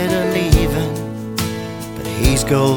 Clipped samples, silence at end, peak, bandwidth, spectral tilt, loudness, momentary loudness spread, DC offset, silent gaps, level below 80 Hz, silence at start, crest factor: under 0.1%; 0 s; 0 dBFS; over 20 kHz; -5.5 dB/octave; -18 LUFS; 11 LU; under 0.1%; none; -24 dBFS; 0 s; 18 dB